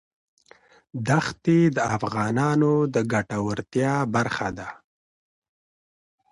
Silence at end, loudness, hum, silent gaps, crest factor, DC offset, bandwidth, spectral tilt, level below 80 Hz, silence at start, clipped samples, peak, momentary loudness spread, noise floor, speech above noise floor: 1.55 s; -23 LUFS; none; none; 16 dB; under 0.1%; 11.5 kHz; -6.5 dB/octave; -56 dBFS; 0.95 s; under 0.1%; -8 dBFS; 11 LU; -55 dBFS; 33 dB